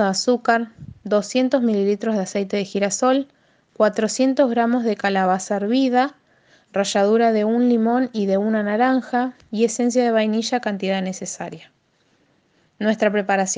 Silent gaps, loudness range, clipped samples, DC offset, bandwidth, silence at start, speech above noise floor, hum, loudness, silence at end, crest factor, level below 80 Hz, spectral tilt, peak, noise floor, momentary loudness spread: none; 4 LU; under 0.1%; under 0.1%; 10 kHz; 0 s; 43 dB; none; -20 LUFS; 0 s; 18 dB; -66 dBFS; -4.5 dB/octave; -2 dBFS; -62 dBFS; 7 LU